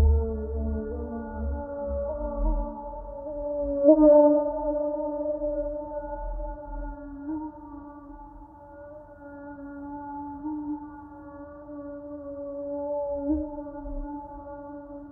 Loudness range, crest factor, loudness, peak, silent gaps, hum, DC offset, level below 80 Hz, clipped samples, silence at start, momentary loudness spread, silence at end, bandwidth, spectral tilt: 17 LU; 22 dB; -28 LUFS; -6 dBFS; none; none; under 0.1%; -36 dBFS; under 0.1%; 0 s; 20 LU; 0 s; 1.9 kHz; -14.5 dB/octave